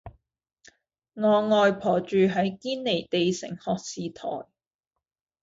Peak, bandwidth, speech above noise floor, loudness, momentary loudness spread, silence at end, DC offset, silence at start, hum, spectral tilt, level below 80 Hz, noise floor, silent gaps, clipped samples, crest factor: -10 dBFS; 8 kHz; 62 dB; -25 LUFS; 13 LU; 1 s; under 0.1%; 0.05 s; none; -5.5 dB/octave; -62 dBFS; -87 dBFS; none; under 0.1%; 16 dB